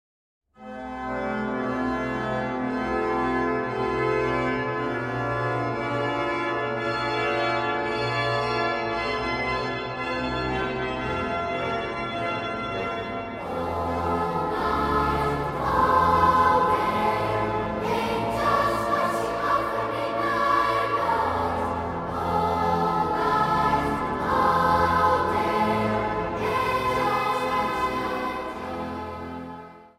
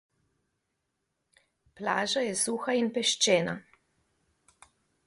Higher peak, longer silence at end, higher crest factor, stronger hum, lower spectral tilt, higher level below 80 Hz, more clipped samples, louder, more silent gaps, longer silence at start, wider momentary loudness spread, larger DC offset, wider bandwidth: first, -8 dBFS vs -12 dBFS; second, 0.1 s vs 1.45 s; about the same, 18 dB vs 22 dB; neither; first, -6 dB/octave vs -2.5 dB/octave; first, -44 dBFS vs -74 dBFS; neither; first, -25 LUFS vs -28 LUFS; neither; second, 0.6 s vs 1.8 s; second, 8 LU vs 11 LU; neither; first, 16 kHz vs 11.5 kHz